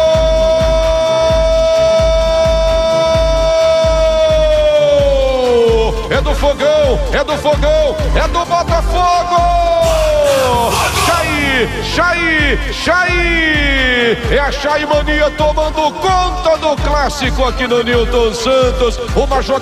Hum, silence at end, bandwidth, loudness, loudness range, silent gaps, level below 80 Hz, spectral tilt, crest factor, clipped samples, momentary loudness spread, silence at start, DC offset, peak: none; 0 s; 15.5 kHz; -12 LUFS; 2 LU; none; -20 dBFS; -4.5 dB/octave; 10 dB; under 0.1%; 4 LU; 0 s; under 0.1%; 0 dBFS